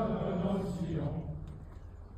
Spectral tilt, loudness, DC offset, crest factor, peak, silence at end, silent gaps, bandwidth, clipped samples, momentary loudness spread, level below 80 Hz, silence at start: -9 dB/octave; -36 LUFS; under 0.1%; 14 dB; -22 dBFS; 0 s; none; 9.8 kHz; under 0.1%; 16 LU; -48 dBFS; 0 s